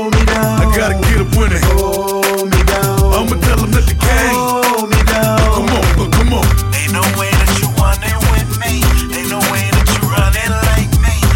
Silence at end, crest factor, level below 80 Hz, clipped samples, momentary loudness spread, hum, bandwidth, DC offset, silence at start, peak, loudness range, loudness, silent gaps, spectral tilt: 0 s; 12 dB; -16 dBFS; under 0.1%; 2 LU; none; 17 kHz; under 0.1%; 0 s; 0 dBFS; 1 LU; -13 LUFS; none; -4.5 dB/octave